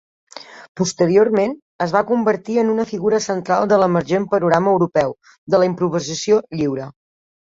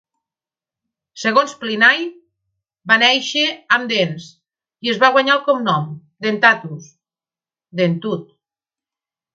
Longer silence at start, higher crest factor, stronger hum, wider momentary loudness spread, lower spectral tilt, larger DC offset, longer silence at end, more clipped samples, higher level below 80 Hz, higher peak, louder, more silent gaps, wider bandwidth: second, 0.35 s vs 1.15 s; about the same, 18 dB vs 18 dB; neither; second, 11 LU vs 17 LU; first, -5.5 dB/octave vs -4 dB/octave; neither; second, 0.65 s vs 1.15 s; neither; first, -58 dBFS vs -70 dBFS; about the same, 0 dBFS vs 0 dBFS; about the same, -18 LUFS vs -16 LUFS; first, 0.69-0.75 s, 1.62-1.79 s, 5.38-5.47 s vs none; about the same, 8 kHz vs 7.8 kHz